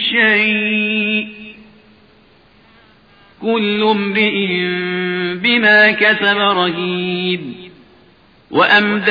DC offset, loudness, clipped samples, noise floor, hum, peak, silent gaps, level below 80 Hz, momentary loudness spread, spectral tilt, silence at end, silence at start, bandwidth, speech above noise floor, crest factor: under 0.1%; -14 LUFS; under 0.1%; -49 dBFS; none; 0 dBFS; none; -60 dBFS; 11 LU; -6.5 dB/octave; 0 s; 0 s; 5.2 kHz; 35 dB; 16 dB